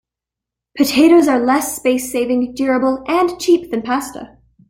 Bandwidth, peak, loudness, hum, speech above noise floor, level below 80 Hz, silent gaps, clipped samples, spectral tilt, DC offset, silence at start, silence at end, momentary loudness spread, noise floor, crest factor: 16.5 kHz; -2 dBFS; -15 LUFS; none; 70 dB; -52 dBFS; none; under 0.1%; -3.5 dB/octave; under 0.1%; 0.75 s; 0.45 s; 10 LU; -85 dBFS; 14 dB